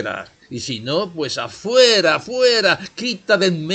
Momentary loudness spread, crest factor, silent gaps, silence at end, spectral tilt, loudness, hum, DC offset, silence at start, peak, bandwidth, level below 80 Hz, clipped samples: 15 LU; 16 dB; none; 0 s; -3.5 dB/octave; -17 LUFS; none; under 0.1%; 0 s; -2 dBFS; 9 kHz; -60 dBFS; under 0.1%